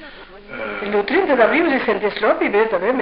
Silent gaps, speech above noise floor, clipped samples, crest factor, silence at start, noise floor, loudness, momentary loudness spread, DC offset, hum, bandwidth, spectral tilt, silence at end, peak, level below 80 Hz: none; 22 dB; under 0.1%; 16 dB; 0 s; -38 dBFS; -17 LUFS; 14 LU; under 0.1%; none; 5.4 kHz; -2.5 dB/octave; 0 s; -2 dBFS; -48 dBFS